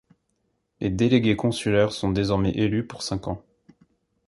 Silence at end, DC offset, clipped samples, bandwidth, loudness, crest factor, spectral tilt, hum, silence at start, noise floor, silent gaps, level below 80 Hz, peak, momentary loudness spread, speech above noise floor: 0.9 s; under 0.1%; under 0.1%; 11.5 kHz; -24 LUFS; 20 dB; -6.5 dB/octave; none; 0.8 s; -73 dBFS; none; -46 dBFS; -6 dBFS; 10 LU; 50 dB